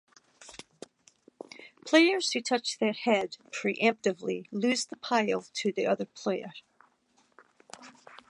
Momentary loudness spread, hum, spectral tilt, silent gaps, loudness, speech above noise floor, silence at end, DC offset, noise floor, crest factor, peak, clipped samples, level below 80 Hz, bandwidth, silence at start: 23 LU; none; -3.5 dB/octave; none; -28 LUFS; 40 dB; 0.15 s; under 0.1%; -69 dBFS; 22 dB; -8 dBFS; under 0.1%; -80 dBFS; 11.5 kHz; 0.4 s